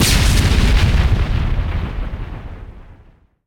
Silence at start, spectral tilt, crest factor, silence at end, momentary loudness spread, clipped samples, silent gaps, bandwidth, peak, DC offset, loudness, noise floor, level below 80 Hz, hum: 0 s; -4.5 dB/octave; 14 dB; 0.55 s; 18 LU; under 0.1%; none; 18.5 kHz; -2 dBFS; under 0.1%; -17 LUFS; -48 dBFS; -18 dBFS; none